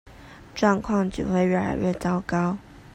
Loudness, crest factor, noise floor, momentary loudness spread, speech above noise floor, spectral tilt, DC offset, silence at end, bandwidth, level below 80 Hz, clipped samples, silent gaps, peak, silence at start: -24 LUFS; 20 dB; -45 dBFS; 6 LU; 22 dB; -7 dB/octave; under 0.1%; 0.15 s; 9.8 kHz; -46 dBFS; under 0.1%; none; -6 dBFS; 0.05 s